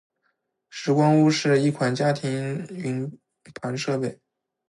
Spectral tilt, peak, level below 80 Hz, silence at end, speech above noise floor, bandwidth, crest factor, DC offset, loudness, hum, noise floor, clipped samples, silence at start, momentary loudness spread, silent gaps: -6 dB/octave; -8 dBFS; -68 dBFS; 0.55 s; 51 dB; 11.5 kHz; 16 dB; under 0.1%; -23 LUFS; none; -74 dBFS; under 0.1%; 0.75 s; 13 LU; none